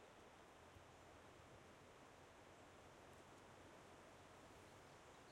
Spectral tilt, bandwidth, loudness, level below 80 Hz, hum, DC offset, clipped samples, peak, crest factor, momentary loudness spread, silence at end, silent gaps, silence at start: -4 dB/octave; 16 kHz; -64 LUFS; -80 dBFS; none; under 0.1%; under 0.1%; -50 dBFS; 14 dB; 1 LU; 0 s; none; 0 s